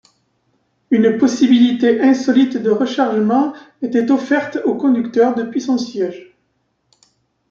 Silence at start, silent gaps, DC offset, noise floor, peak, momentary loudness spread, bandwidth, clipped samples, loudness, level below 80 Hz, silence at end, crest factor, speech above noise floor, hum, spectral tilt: 0.9 s; none; under 0.1%; -66 dBFS; -2 dBFS; 8 LU; 7.4 kHz; under 0.1%; -16 LUFS; -64 dBFS; 1.3 s; 14 dB; 51 dB; none; -5.5 dB/octave